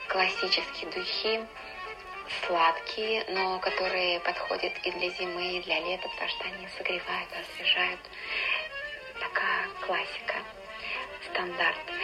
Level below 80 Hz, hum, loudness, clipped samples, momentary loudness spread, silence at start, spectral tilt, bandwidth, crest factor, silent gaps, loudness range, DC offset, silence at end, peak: -62 dBFS; none; -30 LUFS; under 0.1%; 11 LU; 0 s; -3 dB/octave; 15.5 kHz; 20 dB; none; 3 LU; under 0.1%; 0 s; -12 dBFS